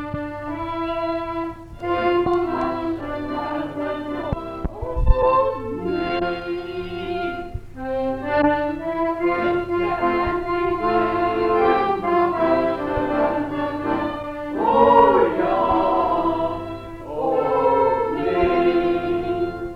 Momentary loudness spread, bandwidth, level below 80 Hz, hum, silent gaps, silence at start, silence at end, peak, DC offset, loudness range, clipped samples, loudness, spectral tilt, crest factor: 10 LU; 5.8 kHz; -34 dBFS; none; none; 0 s; 0 s; 0 dBFS; under 0.1%; 5 LU; under 0.1%; -21 LUFS; -8 dB/octave; 20 dB